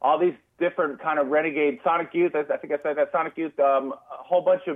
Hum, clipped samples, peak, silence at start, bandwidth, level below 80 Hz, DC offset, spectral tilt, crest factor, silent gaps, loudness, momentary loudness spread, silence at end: none; under 0.1%; -10 dBFS; 0 s; 3.8 kHz; -78 dBFS; under 0.1%; -8 dB/octave; 14 dB; none; -24 LUFS; 6 LU; 0 s